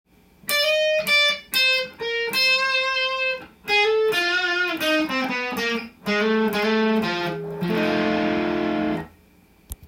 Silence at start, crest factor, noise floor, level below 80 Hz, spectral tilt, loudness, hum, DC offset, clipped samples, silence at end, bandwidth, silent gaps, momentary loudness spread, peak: 0.45 s; 16 dB; -55 dBFS; -54 dBFS; -3.5 dB/octave; -21 LUFS; none; under 0.1%; under 0.1%; 0 s; 16.5 kHz; none; 8 LU; -8 dBFS